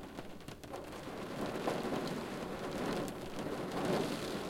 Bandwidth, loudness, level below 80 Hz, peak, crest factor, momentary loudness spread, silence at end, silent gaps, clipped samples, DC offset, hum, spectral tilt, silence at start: 17 kHz; -40 LUFS; -60 dBFS; -22 dBFS; 18 dB; 11 LU; 0 s; none; under 0.1%; under 0.1%; none; -5 dB/octave; 0 s